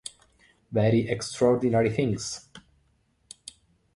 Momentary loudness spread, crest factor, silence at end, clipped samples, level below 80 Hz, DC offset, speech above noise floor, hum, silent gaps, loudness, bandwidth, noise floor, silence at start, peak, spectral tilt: 21 LU; 20 dB; 1.35 s; under 0.1%; -56 dBFS; under 0.1%; 44 dB; none; none; -25 LUFS; 11.5 kHz; -68 dBFS; 0.7 s; -8 dBFS; -6 dB/octave